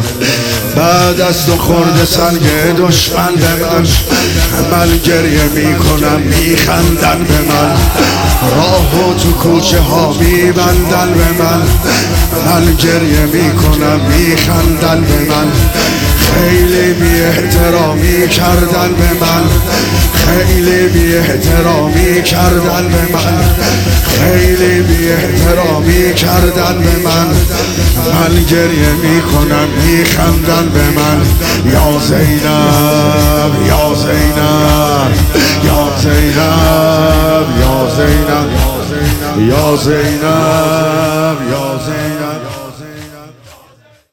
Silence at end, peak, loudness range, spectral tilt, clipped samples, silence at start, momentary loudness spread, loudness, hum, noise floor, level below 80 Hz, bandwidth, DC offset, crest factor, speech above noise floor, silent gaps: 0.85 s; 0 dBFS; 1 LU; -5 dB/octave; under 0.1%; 0 s; 3 LU; -9 LUFS; none; -44 dBFS; -18 dBFS; 18.5 kHz; under 0.1%; 8 dB; 35 dB; none